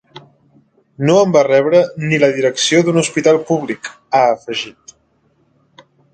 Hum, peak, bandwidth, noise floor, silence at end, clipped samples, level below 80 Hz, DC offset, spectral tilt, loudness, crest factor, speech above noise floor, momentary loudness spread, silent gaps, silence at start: none; 0 dBFS; 9.2 kHz; -59 dBFS; 1.45 s; under 0.1%; -60 dBFS; under 0.1%; -4.5 dB/octave; -14 LUFS; 16 dB; 45 dB; 12 LU; none; 1 s